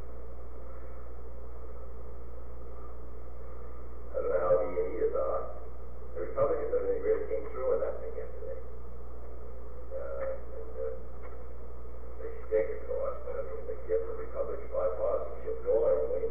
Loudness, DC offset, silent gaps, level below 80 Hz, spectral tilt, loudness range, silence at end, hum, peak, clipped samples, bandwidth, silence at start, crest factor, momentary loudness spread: -34 LUFS; 3%; none; -46 dBFS; -9.5 dB/octave; 10 LU; 0 s; none; -16 dBFS; under 0.1%; 3.3 kHz; 0 s; 18 dB; 18 LU